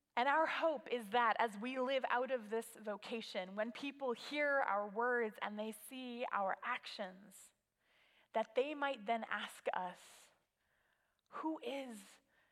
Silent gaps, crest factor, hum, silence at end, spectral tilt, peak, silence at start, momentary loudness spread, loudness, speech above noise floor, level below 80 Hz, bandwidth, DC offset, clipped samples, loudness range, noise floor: none; 22 dB; none; 0.35 s; -3.5 dB/octave; -20 dBFS; 0.15 s; 13 LU; -40 LUFS; 41 dB; under -90 dBFS; 16 kHz; under 0.1%; under 0.1%; 5 LU; -81 dBFS